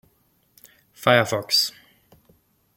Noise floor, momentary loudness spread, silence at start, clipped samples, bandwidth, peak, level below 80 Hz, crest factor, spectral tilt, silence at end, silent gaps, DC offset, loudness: -64 dBFS; 7 LU; 1 s; under 0.1%; 17 kHz; -4 dBFS; -66 dBFS; 22 dB; -3 dB/octave; 1.05 s; none; under 0.1%; -20 LUFS